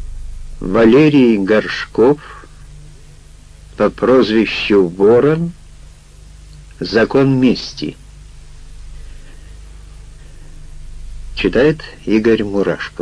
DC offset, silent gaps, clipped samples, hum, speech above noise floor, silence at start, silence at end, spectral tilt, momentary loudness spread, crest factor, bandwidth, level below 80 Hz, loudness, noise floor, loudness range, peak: under 0.1%; none; under 0.1%; 50 Hz at -45 dBFS; 26 dB; 0 s; 0.1 s; -7 dB/octave; 17 LU; 16 dB; 10.5 kHz; -34 dBFS; -13 LUFS; -39 dBFS; 7 LU; 0 dBFS